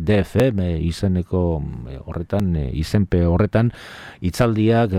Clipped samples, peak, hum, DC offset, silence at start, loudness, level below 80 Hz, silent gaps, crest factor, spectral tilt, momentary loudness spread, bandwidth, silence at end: under 0.1%; -4 dBFS; none; under 0.1%; 0 s; -20 LUFS; -34 dBFS; none; 14 dB; -7.5 dB/octave; 13 LU; 14.5 kHz; 0 s